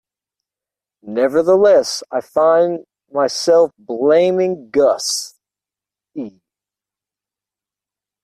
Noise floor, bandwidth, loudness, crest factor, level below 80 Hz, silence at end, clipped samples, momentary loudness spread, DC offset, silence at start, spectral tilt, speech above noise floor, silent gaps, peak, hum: -88 dBFS; 14 kHz; -15 LUFS; 14 dB; -62 dBFS; 1.95 s; under 0.1%; 18 LU; under 0.1%; 1.05 s; -3.5 dB/octave; 74 dB; none; -4 dBFS; none